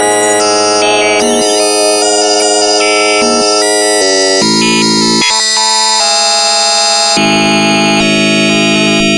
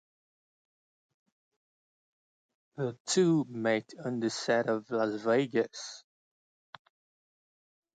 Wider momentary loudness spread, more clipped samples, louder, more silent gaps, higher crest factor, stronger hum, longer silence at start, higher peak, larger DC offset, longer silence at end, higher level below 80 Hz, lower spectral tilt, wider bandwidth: second, 1 LU vs 13 LU; neither; first, -7 LUFS vs -30 LUFS; second, none vs 3.00-3.05 s; second, 8 dB vs 20 dB; neither; second, 0 s vs 2.75 s; first, 0 dBFS vs -14 dBFS; neither; second, 0 s vs 1.95 s; first, -44 dBFS vs -80 dBFS; second, -2 dB/octave vs -5 dB/octave; first, 11.5 kHz vs 9.4 kHz